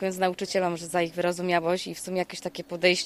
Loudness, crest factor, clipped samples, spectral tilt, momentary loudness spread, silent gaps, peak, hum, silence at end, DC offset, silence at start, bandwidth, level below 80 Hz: -28 LUFS; 20 dB; under 0.1%; -4 dB/octave; 7 LU; none; -6 dBFS; none; 0 s; under 0.1%; 0 s; 15 kHz; -64 dBFS